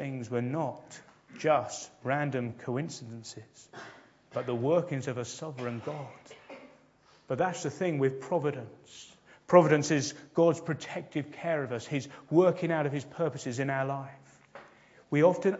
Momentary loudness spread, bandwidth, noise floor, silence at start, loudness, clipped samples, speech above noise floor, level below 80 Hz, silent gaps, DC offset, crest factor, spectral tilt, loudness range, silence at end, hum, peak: 22 LU; 8 kHz; -62 dBFS; 0 s; -30 LUFS; under 0.1%; 32 dB; -74 dBFS; none; under 0.1%; 26 dB; -6 dB/octave; 7 LU; 0 s; none; -6 dBFS